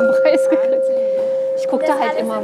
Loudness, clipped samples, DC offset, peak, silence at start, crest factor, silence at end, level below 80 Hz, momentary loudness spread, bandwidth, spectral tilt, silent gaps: -17 LUFS; under 0.1%; under 0.1%; -2 dBFS; 0 s; 14 dB; 0 s; -76 dBFS; 5 LU; 12 kHz; -5 dB/octave; none